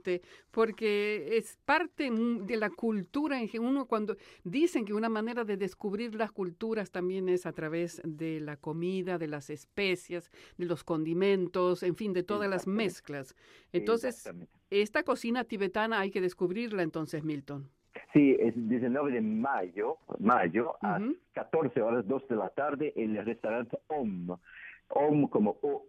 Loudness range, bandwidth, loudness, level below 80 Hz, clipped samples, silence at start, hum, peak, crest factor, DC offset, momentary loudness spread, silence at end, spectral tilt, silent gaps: 4 LU; 14.5 kHz; -32 LUFS; -70 dBFS; under 0.1%; 0.05 s; none; -12 dBFS; 20 dB; under 0.1%; 10 LU; 0.05 s; -6.5 dB/octave; none